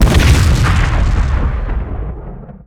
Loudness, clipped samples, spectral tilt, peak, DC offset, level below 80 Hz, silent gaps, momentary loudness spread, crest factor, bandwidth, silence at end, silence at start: -14 LUFS; 0.3%; -5.5 dB/octave; 0 dBFS; under 0.1%; -14 dBFS; none; 16 LU; 12 dB; 15.5 kHz; 0.1 s; 0 s